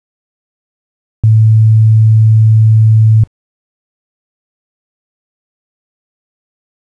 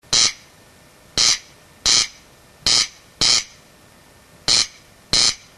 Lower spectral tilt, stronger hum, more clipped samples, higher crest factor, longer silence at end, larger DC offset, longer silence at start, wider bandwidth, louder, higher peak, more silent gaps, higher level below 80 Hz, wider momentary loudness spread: first, -10.5 dB/octave vs 1 dB/octave; neither; neither; second, 8 dB vs 20 dB; first, 3.65 s vs 0.2 s; neither; first, 1.25 s vs 0.1 s; second, 0.4 kHz vs 13 kHz; first, -8 LUFS vs -17 LUFS; about the same, -2 dBFS vs -2 dBFS; neither; about the same, -42 dBFS vs -46 dBFS; second, 4 LU vs 9 LU